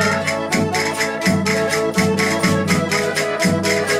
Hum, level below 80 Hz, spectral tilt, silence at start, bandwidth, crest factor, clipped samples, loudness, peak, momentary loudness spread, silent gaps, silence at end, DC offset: none; -50 dBFS; -4 dB/octave; 0 s; 16 kHz; 14 dB; under 0.1%; -18 LUFS; -4 dBFS; 3 LU; none; 0 s; under 0.1%